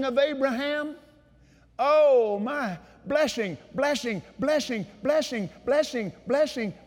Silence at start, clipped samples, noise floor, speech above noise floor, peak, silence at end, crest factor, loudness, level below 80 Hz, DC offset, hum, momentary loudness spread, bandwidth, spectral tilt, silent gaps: 0 s; under 0.1%; -57 dBFS; 32 dB; -12 dBFS; 0.15 s; 14 dB; -26 LUFS; -62 dBFS; under 0.1%; none; 11 LU; 16.5 kHz; -4.5 dB/octave; none